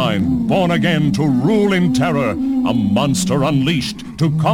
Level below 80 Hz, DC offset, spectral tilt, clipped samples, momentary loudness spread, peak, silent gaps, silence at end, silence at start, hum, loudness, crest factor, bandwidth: -40 dBFS; under 0.1%; -6 dB/octave; under 0.1%; 4 LU; -2 dBFS; none; 0 s; 0 s; none; -16 LUFS; 12 dB; 16.5 kHz